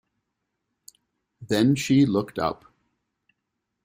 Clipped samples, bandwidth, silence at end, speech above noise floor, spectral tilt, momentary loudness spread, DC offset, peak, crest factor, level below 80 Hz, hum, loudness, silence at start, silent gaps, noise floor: under 0.1%; 16 kHz; 1.3 s; 59 dB; -6 dB/octave; 9 LU; under 0.1%; -8 dBFS; 18 dB; -60 dBFS; none; -23 LUFS; 1.4 s; none; -81 dBFS